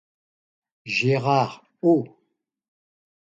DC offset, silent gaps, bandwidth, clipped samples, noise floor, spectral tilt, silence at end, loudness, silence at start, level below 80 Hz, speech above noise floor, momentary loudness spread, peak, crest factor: under 0.1%; none; 7.8 kHz; under 0.1%; -73 dBFS; -6.5 dB/octave; 1.15 s; -22 LUFS; 0.85 s; -70 dBFS; 52 dB; 14 LU; -8 dBFS; 18 dB